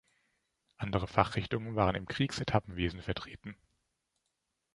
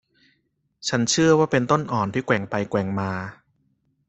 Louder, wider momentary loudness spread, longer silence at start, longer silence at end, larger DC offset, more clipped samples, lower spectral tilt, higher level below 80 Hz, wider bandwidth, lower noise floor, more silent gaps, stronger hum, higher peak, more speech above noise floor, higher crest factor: second, -33 LUFS vs -22 LUFS; about the same, 12 LU vs 12 LU; about the same, 0.8 s vs 0.8 s; first, 1.2 s vs 0.75 s; neither; neither; first, -6 dB/octave vs -4.5 dB/octave; first, -52 dBFS vs -58 dBFS; first, 11.5 kHz vs 8.4 kHz; first, -84 dBFS vs -70 dBFS; neither; neither; second, -8 dBFS vs -4 dBFS; about the same, 50 dB vs 49 dB; first, 28 dB vs 20 dB